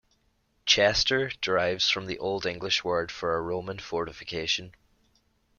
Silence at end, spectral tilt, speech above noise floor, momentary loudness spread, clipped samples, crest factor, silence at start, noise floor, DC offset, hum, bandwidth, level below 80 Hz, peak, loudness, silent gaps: 0.85 s; -2.5 dB/octave; 42 dB; 11 LU; under 0.1%; 22 dB; 0.65 s; -70 dBFS; under 0.1%; none; 7.2 kHz; -54 dBFS; -6 dBFS; -27 LUFS; none